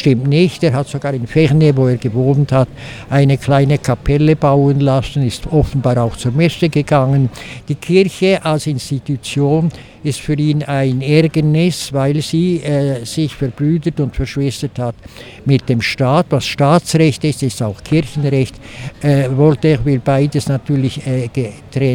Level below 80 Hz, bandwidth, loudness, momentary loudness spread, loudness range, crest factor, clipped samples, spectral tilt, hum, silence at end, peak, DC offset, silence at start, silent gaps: -36 dBFS; 15 kHz; -15 LUFS; 9 LU; 3 LU; 14 dB; under 0.1%; -7 dB/octave; none; 0 s; 0 dBFS; under 0.1%; 0 s; none